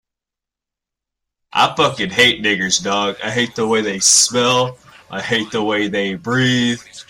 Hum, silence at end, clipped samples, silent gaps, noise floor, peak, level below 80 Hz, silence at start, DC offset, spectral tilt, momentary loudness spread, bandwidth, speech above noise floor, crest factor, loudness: none; 0.05 s; under 0.1%; none; -86 dBFS; 0 dBFS; -56 dBFS; 1.55 s; under 0.1%; -2.5 dB/octave; 9 LU; 16 kHz; 69 dB; 18 dB; -15 LUFS